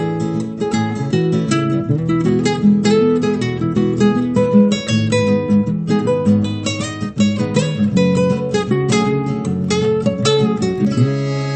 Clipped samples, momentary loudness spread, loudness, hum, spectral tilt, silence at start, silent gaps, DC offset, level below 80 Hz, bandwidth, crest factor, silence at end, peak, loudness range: under 0.1%; 6 LU; -16 LUFS; none; -6.5 dB/octave; 0 s; none; under 0.1%; -48 dBFS; 8.8 kHz; 14 dB; 0 s; -2 dBFS; 2 LU